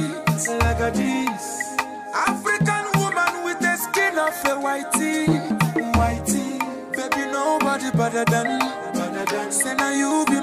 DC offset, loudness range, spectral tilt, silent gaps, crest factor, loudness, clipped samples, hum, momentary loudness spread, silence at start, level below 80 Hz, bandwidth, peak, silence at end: under 0.1%; 1 LU; -4.5 dB/octave; none; 12 dB; -22 LUFS; under 0.1%; none; 6 LU; 0 s; -38 dBFS; 15.5 kHz; -8 dBFS; 0 s